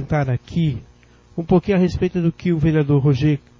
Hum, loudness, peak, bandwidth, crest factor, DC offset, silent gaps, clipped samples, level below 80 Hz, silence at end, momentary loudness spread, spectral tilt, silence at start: none; -19 LUFS; -4 dBFS; 7.2 kHz; 16 dB; under 0.1%; none; under 0.1%; -38 dBFS; 0.2 s; 8 LU; -9 dB/octave; 0 s